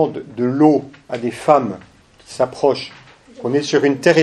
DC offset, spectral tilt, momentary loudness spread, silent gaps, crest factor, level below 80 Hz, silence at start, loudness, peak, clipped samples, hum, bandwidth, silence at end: under 0.1%; -5.5 dB/octave; 15 LU; none; 18 dB; -58 dBFS; 0 s; -17 LUFS; 0 dBFS; under 0.1%; none; 12 kHz; 0 s